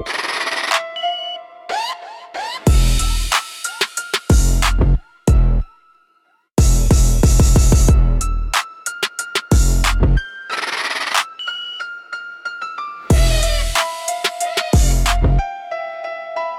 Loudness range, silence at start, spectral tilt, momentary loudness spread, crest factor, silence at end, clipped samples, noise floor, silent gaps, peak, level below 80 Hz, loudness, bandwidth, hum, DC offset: 4 LU; 0 s; -4 dB/octave; 13 LU; 14 dB; 0 s; under 0.1%; -60 dBFS; none; -2 dBFS; -18 dBFS; -18 LUFS; 15.5 kHz; none; under 0.1%